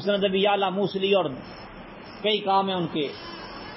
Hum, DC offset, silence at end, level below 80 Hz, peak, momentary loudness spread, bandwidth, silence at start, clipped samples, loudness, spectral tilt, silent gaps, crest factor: none; under 0.1%; 0 s; -58 dBFS; -10 dBFS; 19 LU; 5.8 kHz; 0 s; under 0.1%; -24 LUFS; -9.5 dB/octave; none; 16 dB